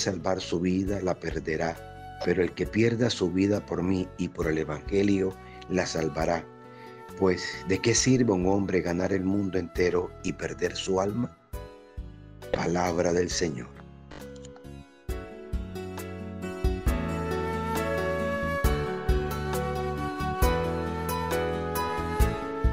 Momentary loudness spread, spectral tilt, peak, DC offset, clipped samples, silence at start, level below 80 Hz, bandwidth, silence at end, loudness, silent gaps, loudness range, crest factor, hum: 18 LU; -5.5 dB/octave; -10 dBFS; under 0.1%; under 0.1%; 0 s; -38 dBFS; 16 kHz; 0 s; -28 LUFS; none; 6 LU; 18 dB; none